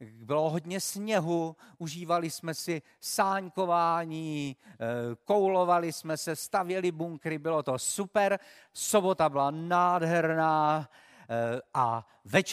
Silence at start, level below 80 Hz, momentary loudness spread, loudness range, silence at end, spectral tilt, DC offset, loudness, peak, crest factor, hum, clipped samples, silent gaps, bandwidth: 0 s; -74 dBFS; 10 LU; 4 LU; 0 s; -4.5 dB/octave; under 0.1%; -30 LUFS; -8 dBFS; 20 dB; none; under 0.1%; none; 15.5 kHz